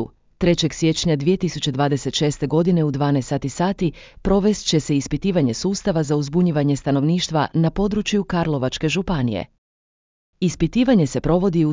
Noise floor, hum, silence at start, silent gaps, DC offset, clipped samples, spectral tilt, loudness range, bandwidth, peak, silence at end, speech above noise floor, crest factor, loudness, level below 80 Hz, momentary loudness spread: under -90 dBFS; none; 0 s; 9.58-10.33 s; under 0.1%; under 0.1%; -6 dB/octave; 2 LU; 7.6 kHz; -4 dBFS; 0 s; over 71 dB; 16 dB; -20 LUFS; -40 dBFS; 5 LU